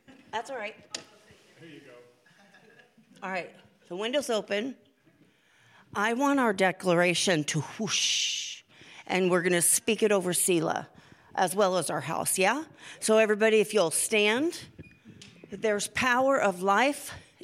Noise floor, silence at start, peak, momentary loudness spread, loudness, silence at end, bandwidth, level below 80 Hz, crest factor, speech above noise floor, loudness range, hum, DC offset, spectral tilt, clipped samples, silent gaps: -63 dBFS; 0.1 s; -10 dBFS; 15 LU; -26 LUFS; 0.25 s; 16 kHz; -70 dBFS; 18 dB; 36 dB; 10 LU; none; under 0.1%; -3 dB/octave; under 0.1%; none